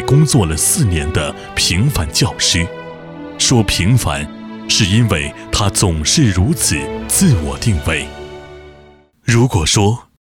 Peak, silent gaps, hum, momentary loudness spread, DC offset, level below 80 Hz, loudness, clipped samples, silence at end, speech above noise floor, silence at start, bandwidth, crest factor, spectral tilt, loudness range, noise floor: -2 dBFS; none; none; 14 LU; under 0.1%; -30 dBFS; -14 LUFS; under 0.1%; 0.3 s; 31 dB; 0 s; 17.5 kHz; 14 dB; -4 dB/octave; 2 LU; -45 dBFS